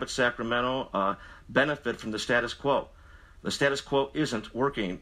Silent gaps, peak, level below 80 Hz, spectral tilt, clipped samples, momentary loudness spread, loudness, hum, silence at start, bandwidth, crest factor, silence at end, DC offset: none; -8 dBFS; -52 dBFS; -4.5 dB/octave; under 0.1%; 7 LU; -28 LUFS; none; 0 s; 15 kHz; 20 dB; 0 s; under 0.1%